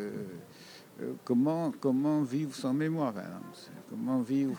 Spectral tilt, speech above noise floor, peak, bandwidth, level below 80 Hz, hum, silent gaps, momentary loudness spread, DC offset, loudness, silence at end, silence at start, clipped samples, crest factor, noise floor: -7.5 dB/octave; 21 dB; -18 dBFS; over 20 kHz; -82 dBFS; none; none; 19 LU; under 0.1%; -32 LUFS; 0 s; 0 s; under 0.1%; 16 dB; -52 dBFS